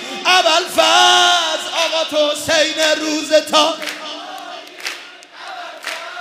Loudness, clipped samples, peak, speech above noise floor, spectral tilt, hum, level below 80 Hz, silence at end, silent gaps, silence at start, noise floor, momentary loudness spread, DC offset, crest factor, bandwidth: -14 LUFS; under 0.1%; 0 dBFS; 21 dB; 0 dB/octave; none; -64 dBFS; 0 s; none; 0 s; -36 dBFS; 20 LU; under 0.1%; 16 dB; 16 kHz